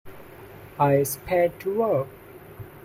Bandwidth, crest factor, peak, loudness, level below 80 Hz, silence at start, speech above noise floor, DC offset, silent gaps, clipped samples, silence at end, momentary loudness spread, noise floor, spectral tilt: 16 kHz; 18 dB; -8 dBFS; -24 LUFS; -54 dBFS; 0.05 s; 21 dB; under 0.1%; none; under 0.1%; 0 s; 24 LU; -44 dBFS; -6 dB/octave